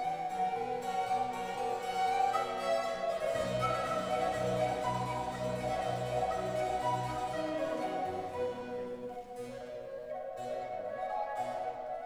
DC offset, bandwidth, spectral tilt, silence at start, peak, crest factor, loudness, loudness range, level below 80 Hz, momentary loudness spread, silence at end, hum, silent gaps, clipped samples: under 0.1%; 16 kHz; -5 dB/octave; 0 s; -18 dBFS; 16 dB; -35 LUFS; 7 LU; -60 dBFS; 9 LU; 0 s; none; none; under 0.1%